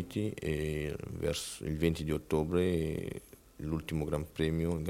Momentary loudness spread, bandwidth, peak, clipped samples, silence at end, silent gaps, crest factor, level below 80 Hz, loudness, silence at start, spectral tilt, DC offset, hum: 8 LU; 16.5 kHz; -14 dBFS; under 0.1%; 0 s; none; 18 dB; -50 dBFS; -34 LUFS; 0 s; -6 dB/octave; under 0.1%; none